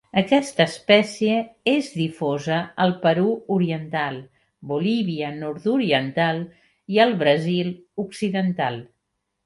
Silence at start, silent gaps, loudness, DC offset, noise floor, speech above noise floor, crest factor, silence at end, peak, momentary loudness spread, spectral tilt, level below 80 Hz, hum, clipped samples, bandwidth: 0.15 s; none; -22 LUFS; under 0.1%; -77 dBFS; 55 dB; 18 dB; 0.6 s; -4 dBFS; 11 LU; -6 dB/octave; -66 dBFS; none; under 0.1%; 11.5 kHz